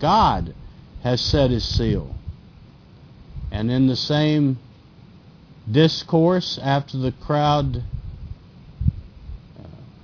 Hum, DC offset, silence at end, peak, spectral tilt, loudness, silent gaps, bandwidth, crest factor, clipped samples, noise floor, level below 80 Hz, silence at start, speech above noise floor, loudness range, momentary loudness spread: none; under 0.1%; 0.15 s; -4 dBFS; -6.5 dB/octave; -21 LUFS; none; 5.4 kHz; 18 dB; under 0.1%; -47 dBFS; -36 dBFS; 0 s; 27 dB; 4 LU; 23 LU